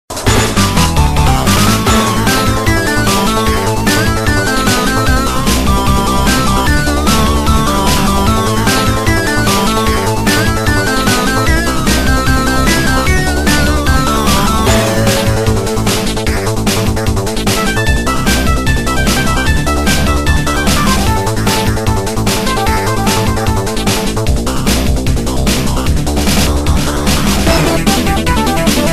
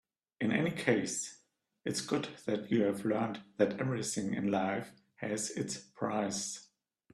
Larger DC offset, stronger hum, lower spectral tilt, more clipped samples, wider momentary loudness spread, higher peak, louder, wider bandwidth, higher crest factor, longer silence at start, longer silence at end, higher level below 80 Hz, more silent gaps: first, 2% vs under 0.1%; neither; about the same, -4.5 dB/octave vs -4.5 dB/octave; neither; second, 3 LU vs 9 LU; first, 0 dBFS vs -14 dBFS; first, -12 LUFS vs -35 LUFS; first, 15.5 kHz vs 13.5 kHz; second, 12 dB vs 22 dB; second, 0.1 s vs 0.4 s; second, 0 s vs 0.5 s; first, -18 dBFS vs -72 dBFS; neither